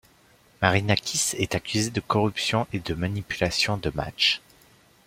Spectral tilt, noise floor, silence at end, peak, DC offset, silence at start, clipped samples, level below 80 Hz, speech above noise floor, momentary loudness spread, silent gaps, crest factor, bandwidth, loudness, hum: -3.5 dB/octave; -58 dBFS; 0.7 s; -2 dBFS; under 0.1%; 0.6 s; under 0.1%; -50 dBFS; 33 dB; 7 LU; none; 24 dB; 16.5 kHz; -25 LUFS; none